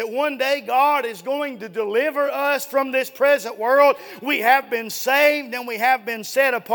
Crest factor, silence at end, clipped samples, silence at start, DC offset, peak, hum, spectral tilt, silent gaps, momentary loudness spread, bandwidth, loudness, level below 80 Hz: 18 dB; 0 s; under 0.1%; 0 s; under 0.1%; -2 dBFS; none; -2 dB/octave; none; 9 LU; 19.5 kHz; -20 LUFS; -80 dBFS